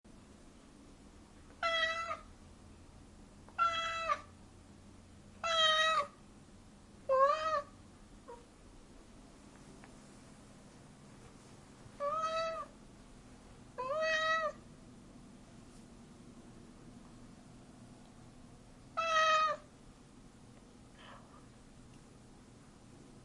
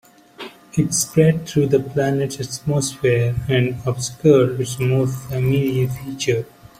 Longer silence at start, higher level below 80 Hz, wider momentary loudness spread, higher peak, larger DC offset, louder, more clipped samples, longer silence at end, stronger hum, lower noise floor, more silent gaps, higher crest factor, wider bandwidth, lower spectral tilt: second, 0.05 s vs 0.4 s; second, -64 dBFS vs -48 dBFS; first, 28 LU vs 9 LU; second, -18 dBFS vs -2 dBFS; neither; second, -34 LUFS vs -19 LUFS; neither; second, 0.05 s vs 0.35 s; neither; first, -58 dBFS vs -39 dBFS; neither; about the same, 22 dB vs 18 dB; second, 11.5 kHz vs 15.5 kHz; second, -2 dB/octave vs -5.5 dB/octave